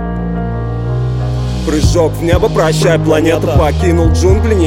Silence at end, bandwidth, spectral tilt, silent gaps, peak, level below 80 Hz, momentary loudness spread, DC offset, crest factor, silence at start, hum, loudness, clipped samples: 0 s; 16.5 kHz; -6.5 dB/octave; none; 0 dBFS; -18 dBFS; 8 LU; under 0.1%; 10 dB; 0 s; none; -12 LUFS; under 0.1%